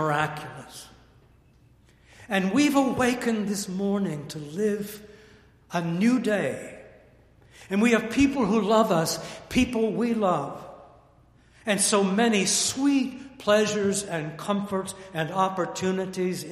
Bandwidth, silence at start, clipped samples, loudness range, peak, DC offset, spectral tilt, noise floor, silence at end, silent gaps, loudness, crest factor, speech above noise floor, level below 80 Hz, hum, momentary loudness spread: 15.5 kHz; 0 s; under 0.1%; 4 LU; -8 dBFS; under 0.1%; -4.5 dB/octave; -58 dBFS; 0 s; none; -25 LUFS; 18 dB; 33 dB; -54 dBFS; none; 14 LU